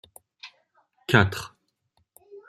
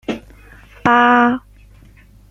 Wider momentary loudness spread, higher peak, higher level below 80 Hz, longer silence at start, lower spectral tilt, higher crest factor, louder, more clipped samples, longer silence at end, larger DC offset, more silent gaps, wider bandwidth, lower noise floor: first, 25 LU vs 16 LU; about the same, -2 dBFS vs -2 dBFS; second, -58 dBFS vs -46 dBFS; first, 0.45 s vs 0.1 s; about the same, -5.5 dB/octave vs -6 dB/octave; first, 26 dB vs 16 dB; second, -23 LUFS vs -14 LUFS; neither; second, 0.1 s vs 0.9 s; neither; neither; first, 15.5 kHz vs 7.6 kHz; first, -72 dBFS vs -45 dBFS